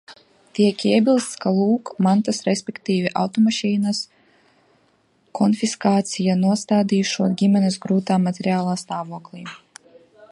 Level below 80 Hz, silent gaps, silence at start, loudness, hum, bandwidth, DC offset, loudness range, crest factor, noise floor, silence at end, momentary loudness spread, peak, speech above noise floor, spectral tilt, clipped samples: -68 dBFS; none; 0.1 s; -20 LUFS; none; 11.5 kHz; under 0.1%; 3 LU; 18 dB; -61 dBFS; 0.05 s; 12 LU; -4 dBFS; 42 dB; -5.5 dB/octave; under 0.1%